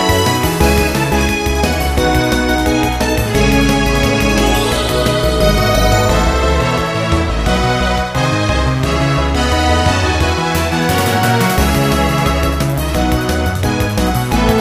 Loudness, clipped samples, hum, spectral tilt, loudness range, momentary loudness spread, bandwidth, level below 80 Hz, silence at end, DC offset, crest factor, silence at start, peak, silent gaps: -14 LUFS; under 0.1%; none; -5 dB/octave; 2 LU; 3 LU; 16 kHz; -20 dBFS; 0 s; 0.4%; 14 dB; 0 s; 0 dBFS; none